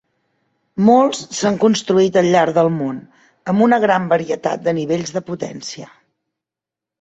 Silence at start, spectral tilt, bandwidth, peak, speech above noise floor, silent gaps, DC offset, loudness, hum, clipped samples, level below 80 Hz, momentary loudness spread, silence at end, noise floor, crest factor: 0.75 s; -5.5 dB/octave; 8.2 kHz; -2 dBFS; 71 dB; none; under 0.1%; -16 LUFS; none; under 0.1%; -60 dBFS; 16 LU; 1.15 s; -87 dBFS; 16 dB